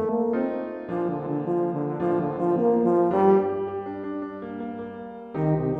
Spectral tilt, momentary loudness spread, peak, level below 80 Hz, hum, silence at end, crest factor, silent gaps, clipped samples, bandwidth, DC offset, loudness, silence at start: -11 dB/octave; 14 LU; -8 dBFS; -58 dBFS; none; 0 s; 16 dB; none; under 0.1%; 4.1 kHz; under 0.1%; -25 LUFS; 0 s